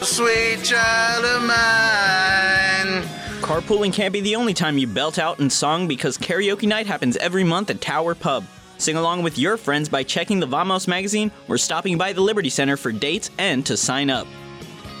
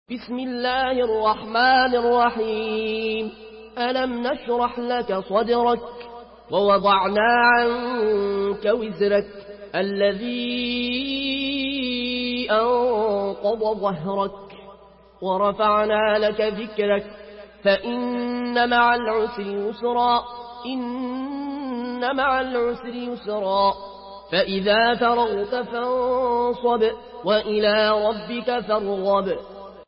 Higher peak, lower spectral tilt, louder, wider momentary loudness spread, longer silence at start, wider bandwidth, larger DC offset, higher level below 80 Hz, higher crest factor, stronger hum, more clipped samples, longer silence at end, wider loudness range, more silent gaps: about the same, -8 dBFS vs -6 dBFS; second, -3 dB/octave vs -9.5 dB/octave; about the same, -20 LUFS vs -22 LUFS; second, 8 LU vs 11 LU; about the same, 0 s vs 0.1 s; first, 16.5 kHz vs 5.8 kHz; neither; about the same, -50 dBFS vs -54 dBFS; about the same, 14 dB vs 16 dB; neither; neither; about the same, 0 s vs 0.05 s; about the same, 4 LU vs 4 LU; neither